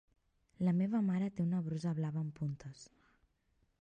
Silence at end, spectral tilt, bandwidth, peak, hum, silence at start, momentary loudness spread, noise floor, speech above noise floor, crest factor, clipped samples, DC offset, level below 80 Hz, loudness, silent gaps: 0.95 s; -8.5 dB/octave; 9 kHz; -22 dBFS; none; 0.6 s; 13 LU; -77 dBFS; 41 dB; 16 dB; under 0.1%; under 0.1%; -72 dBFS; -36 LUFS; none